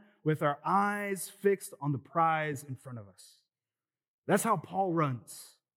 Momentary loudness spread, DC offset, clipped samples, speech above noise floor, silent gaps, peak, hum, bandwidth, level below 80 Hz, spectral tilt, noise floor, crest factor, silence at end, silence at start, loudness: 17 LU; under 0.1%; under 0.1%; over 58 dB; 4.08-4.23 s; -14 dBFS; none; 17.5 kHz; under -90 dBFS; -5.5 dB/octave; under -90 dBFS; 18 dB; 0.3 s; 0.25 s; -31 LUFS